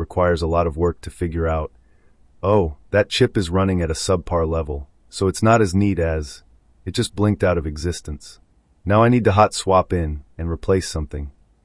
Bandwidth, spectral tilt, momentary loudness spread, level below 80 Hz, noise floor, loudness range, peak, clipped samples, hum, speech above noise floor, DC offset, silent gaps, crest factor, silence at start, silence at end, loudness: 12 kHz; -6 dB/octave; 15 LU; -38 dBFS; -52 dBFS; 2 LU; -2 dBFS; under 0.1%; none; 33 dB; under 0.1%; none; 18 dB; 0 s; 0.35 s; -20 LUFS